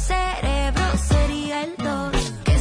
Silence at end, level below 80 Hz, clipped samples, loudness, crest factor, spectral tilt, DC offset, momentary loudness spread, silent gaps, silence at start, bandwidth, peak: 0 s; -24 dBFS; under 0.1%; -23 LUFS; 12 dB; -5 dB/octave; under 0.1%; 6 LU; none; 0 s; 11 kHz; -8 dBFS